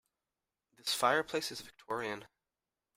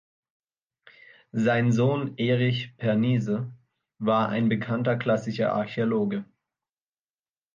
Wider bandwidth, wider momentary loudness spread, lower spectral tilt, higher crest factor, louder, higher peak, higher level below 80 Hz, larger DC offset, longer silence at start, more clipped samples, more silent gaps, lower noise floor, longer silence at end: first, 16 kHz vs 7.4 kHz; first, 13 LU vs 7 LU; second, -2 dB/octave vs -7.5 dB/octave; first, 24 dB vs 16 dB; second, -35 LUFS vs -26 LUFS; second, -16 dBFS vs -12 dBFS; second, -76 dBFS vs -68 dBFS; neither; second, 0.85 s vs 1.35 s; neither; neither; about the same, under -90 dBFS vs under -90 dBFS; second, 0.7 s vs 1.3 s